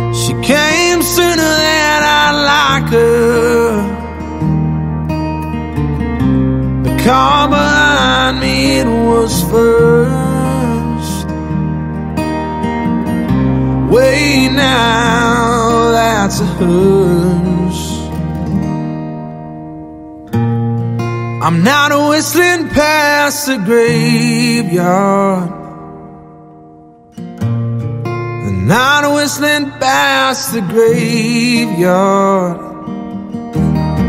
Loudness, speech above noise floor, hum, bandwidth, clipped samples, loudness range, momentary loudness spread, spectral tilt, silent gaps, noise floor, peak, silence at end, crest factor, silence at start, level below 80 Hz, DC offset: -12 LUFS; 28 dB; none; 16 kHz; under 0.1%; 6 LU; 10 LU; -5 dB/octave; none; -39 dBFS; 0 dBFS; 0 s; 12 dB; 0 s; -30 dBFS; under 0.1%